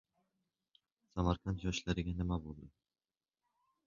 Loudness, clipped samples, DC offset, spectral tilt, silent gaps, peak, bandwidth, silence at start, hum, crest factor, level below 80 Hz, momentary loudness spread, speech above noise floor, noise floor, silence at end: -39 LUFS; under 0.1%; under 0.1%; -6 dB/octave; none; -18 dBFS; 7.2 kHz; 1.15 s; none; 22 dB; -50 dBFS; 12 LU; over 52 dB; under -90 dBFS; 1.2 s